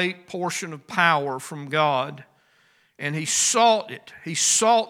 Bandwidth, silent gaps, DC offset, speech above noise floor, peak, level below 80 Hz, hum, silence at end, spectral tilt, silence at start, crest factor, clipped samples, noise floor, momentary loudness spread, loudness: 17 kHz; none; under 0.1%; 39 dB; -4 dBFS; -76 dBFS; none; 0 s; -2 dB/octave; 0 s; 20 dB; under 0.1%; -61 dBFS; 15 LU; -22 LUFS